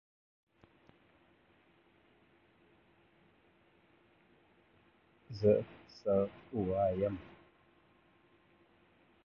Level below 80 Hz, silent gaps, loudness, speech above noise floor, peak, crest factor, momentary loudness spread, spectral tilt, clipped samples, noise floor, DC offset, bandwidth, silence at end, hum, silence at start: -64 dBFS; none; -34 LUFS; 36 dB; -16 dBFS; 24 dB; 19 LU; -8 dB/octave; under 0.1%; -69 dBFS; under 0.1%; 6.6 kHz; 1.95 s; none; 5.3 s